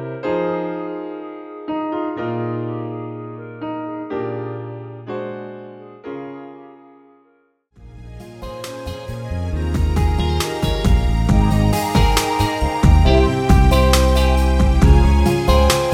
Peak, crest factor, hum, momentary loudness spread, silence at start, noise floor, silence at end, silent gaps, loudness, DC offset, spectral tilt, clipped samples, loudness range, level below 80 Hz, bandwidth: 0 dBFS; 16 dB; none; 19 LU; 0 s; -60 dBFS; 0 s; none; -18 LUFS; under 0.1%; -6 dB/octave; under 0.1%; 19 LU; -20 dBFS; 16 kHz